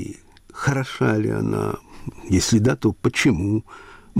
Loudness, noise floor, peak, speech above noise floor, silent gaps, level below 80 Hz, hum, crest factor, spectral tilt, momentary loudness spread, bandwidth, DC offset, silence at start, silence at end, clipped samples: -21 LUFS; -41 dBFS; -8 dBFS; 20 dB; none; -44 dBFS; none; 14 dB; -5.5 dB/octave; 16 LU; 15.5 kHz; under 0.1%; 0 s; 0 s; under 0.1%